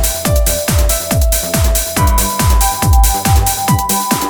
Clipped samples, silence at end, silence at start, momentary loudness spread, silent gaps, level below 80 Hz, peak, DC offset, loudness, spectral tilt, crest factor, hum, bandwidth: under 0.1%; 0 s; 0 s; 2 LU; none; -16 dBFS; 0 dBFS; under 0.1%; -13 LUFS; -4 dB/octave; 12 dB; none; over 20 kHz